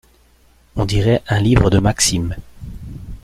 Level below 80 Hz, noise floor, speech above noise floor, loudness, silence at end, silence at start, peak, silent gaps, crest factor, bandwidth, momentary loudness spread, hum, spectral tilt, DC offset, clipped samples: -30 dBFS; -52 dBFS; 37 dB; -16 LUFS; 0.05 s; 0.75 s; -2 dBFS; none; 16 dB; 15 kHz; 20 LU; none; -5 dB/octave; under 0.1%; under 0.1%